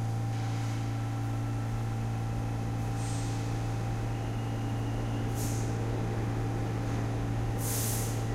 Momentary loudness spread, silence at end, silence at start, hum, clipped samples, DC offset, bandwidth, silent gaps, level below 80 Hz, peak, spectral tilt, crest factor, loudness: 2 LU; 0 s; 0 s; none; under 0.1%; under 0.1%; 16 kHz; none; -42 dBFS; -18 dBFS; -6 dB/octave; 12 dB; -33 LUFS